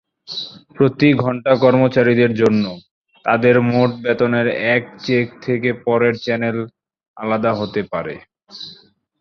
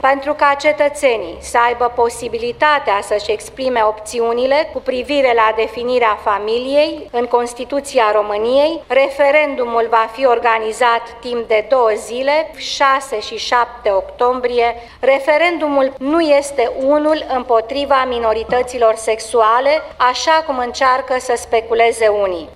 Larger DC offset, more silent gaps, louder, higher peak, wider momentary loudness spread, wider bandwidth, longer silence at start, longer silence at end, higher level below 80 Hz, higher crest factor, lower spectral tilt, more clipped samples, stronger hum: neither; first, 2.91-3.01 s, 7.08-7.14 s vs none; about the same, -17 LUFS vs -15 LUFS; about the same, -2 dBFS vs 0 dBFS; first, 16 LU vs 6 LU; second, 7 kHz vs 14 kHz; first, 0.3 s vs 0.05 s; first, 0.45 s vs 0 s; second, -56 dBFS vs -46 dBFS; about the same, 16 dB vs 16 dB; first, -7.5 dB/octave vs -3 dB/octave; neither; neither